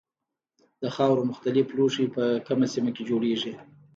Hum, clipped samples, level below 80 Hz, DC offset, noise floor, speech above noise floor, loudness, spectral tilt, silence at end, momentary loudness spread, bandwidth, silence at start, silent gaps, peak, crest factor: none; under 0.1%; -72 dBFS; under 0.1%; -87 dBFS; 62 dB; -26 LUFS; -6 dB/octave; 0.35 s; 10 LU; 7.8 kHz; 0.8 s; none; -10 dBFS; 16 dB